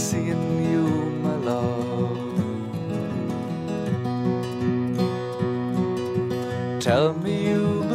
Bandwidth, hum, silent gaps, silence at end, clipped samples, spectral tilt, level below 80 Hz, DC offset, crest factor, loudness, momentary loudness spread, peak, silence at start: 15.5 kHz; none; none; 0 s; under 0.1%; -6.5 dB/octave; -58 dBFS; under 0.1%; 18 dB; -25 LUFS; 6 LU; -6 dBFS; 0 s